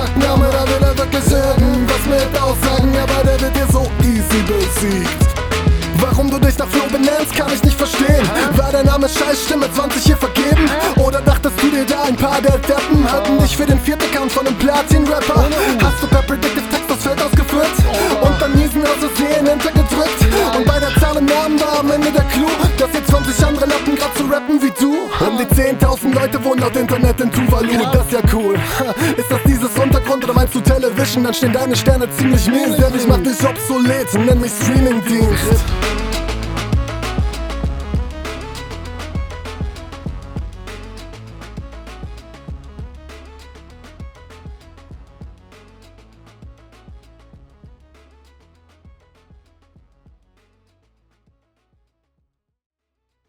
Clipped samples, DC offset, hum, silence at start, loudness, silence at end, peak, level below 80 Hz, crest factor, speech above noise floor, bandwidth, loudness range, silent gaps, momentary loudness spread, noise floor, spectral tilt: under 0.1%; under 0.1%; none; 0 s; -15 LUFS; 6.3 s; 0 dBFS; -22 dBFS; 14 dB; 62 dB; over 20 kHz; 12 LU; none; 13 LU; -75 dBFS; -5.5 dB/octave